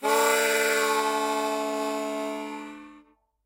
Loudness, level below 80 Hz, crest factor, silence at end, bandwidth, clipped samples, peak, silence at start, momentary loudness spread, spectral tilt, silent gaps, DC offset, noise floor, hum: -25 LUFS; -76 dBFS; 16 dB; 0.45 s; 16 kHz; under 0.1%; -10 dBFS; 0 s; 16 LU; -1 dB/octave; none; under 0.1%; -58 dBFS; none